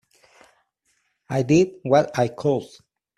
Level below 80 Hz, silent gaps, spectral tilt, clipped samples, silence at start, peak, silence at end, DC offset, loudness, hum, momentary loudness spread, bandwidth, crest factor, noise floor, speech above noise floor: -58 dBFS; none; -6.5 dB/octave; under 0.1%; 1.3 s; -4 dBFS; 0.5 s; under 0.1%; -21 LUFS; none; 8 LU; 13 kHz; 20 dB; -70 dBFS; 50 dB